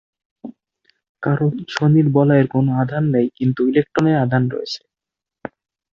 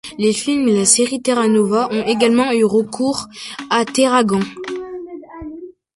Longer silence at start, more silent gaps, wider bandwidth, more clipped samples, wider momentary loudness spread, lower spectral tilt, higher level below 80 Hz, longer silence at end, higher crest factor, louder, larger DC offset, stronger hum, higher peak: first, 0.45 s vs 0.05 s; first, 1.09-1.15 s vs none; second, 7.4 kHz vs 11.5 kHz; neither; first, 22 LU vs 18 LU; first, -8.5 dB/octave vs -3.5 dB/octave; about the same, -56 dBFS vs -54 dBFS; first, 1.15 s vs 0.25 s; about the same, 16 dB vs 16 dB; about the same, -17 LUFS vs -16 LUFS; neither; neither; about the same, -2 dBFS vs 0 dBFS